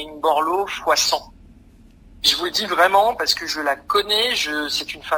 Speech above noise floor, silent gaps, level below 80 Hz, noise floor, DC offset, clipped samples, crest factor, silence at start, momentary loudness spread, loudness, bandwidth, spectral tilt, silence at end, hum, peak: 28 dB; none; -50 dBFS; -48 dBFS; under 0.1%; under 0.1%; 18 dB; 0 s; 7 LU; -19 LUFS; 16 kHz; -0.5 dB/octave; 0 s; none; -2 dBFS